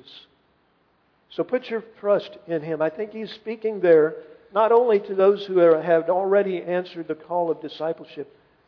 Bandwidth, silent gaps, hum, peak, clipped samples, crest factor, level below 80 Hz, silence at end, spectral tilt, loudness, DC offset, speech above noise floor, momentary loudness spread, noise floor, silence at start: 5.4 kHz; none; none; -6 dBFS; under 0.1%; 16 dB; -74 dBFS; 0.45 s; -8 dB/octave; -22 LUFS; under 0.1%; 43 dB; 15 LU; -64 dBFS; 0.15 s